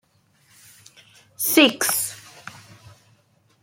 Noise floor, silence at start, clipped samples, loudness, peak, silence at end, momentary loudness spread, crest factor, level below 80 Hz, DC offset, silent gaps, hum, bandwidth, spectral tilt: -61 dBFS; 1.4 s; under 0.1%; -19 LUFS; -2 dBFS; 1.15 s; 25 LU; 24 dB; -70 dBFS; under 0.1%; none; none; 16.5 kHz; -1.5 dB/octave